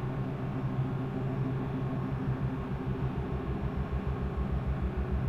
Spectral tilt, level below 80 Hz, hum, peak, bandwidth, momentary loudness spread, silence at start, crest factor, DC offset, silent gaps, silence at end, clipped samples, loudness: -9.5 dB/octave; -40 dBFS; none; -20 dBFS; 5.8 kHz; 2 LU; 0 s; 12 dB; under 0.1%; none; 0 s; under 0.1%; -34 LUFS